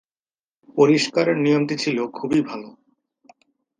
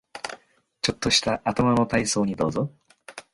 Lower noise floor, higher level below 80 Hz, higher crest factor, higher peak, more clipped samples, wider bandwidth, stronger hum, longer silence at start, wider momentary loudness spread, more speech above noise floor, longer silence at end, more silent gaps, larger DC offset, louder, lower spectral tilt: first, under -90 dBFS vs -52 dBFS; second, -66 dBFS vs -50 dBFS; about the same, 20 dB vs 20 dB; first, -2 dBFS vs -6 dBFS; neither; second, 9.8 kHz vs 11.5 kHz; neither; first, 0.75 s vs 0.15 s; about the same, 14 LU vs 15 LU; first, over 70 dB vs 29 dB; first, 1.1 s vs 0.1 s; neither; neither; first, -20 LUFS vs -23 LUFS; first, -5.5 dB/octave vs -4 dB/octave